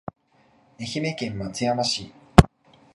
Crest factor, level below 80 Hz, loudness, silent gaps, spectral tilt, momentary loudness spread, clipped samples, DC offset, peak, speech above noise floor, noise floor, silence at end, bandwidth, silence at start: 24 dB; -34 dBFS; -23 LUFS; none; -5.5 dB/octave; 14 LU; under 0.1%; under 0.1%; 0 dBFS; 34 dB; -60 dBFS; 0.5 s; 13 kHz; 0.8 s